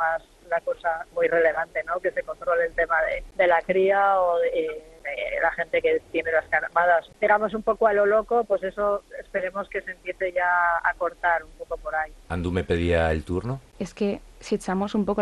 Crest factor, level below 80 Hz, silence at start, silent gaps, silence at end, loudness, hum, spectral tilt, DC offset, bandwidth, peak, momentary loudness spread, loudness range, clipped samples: 16 dB; -46 dBFS; 0 s; none; 0 s; -24 LUFS; none; -6.5 dB/octave; under 0.1%; 12 kHz; -8 dBFS; 10 LU; 4 LU; under 0.1%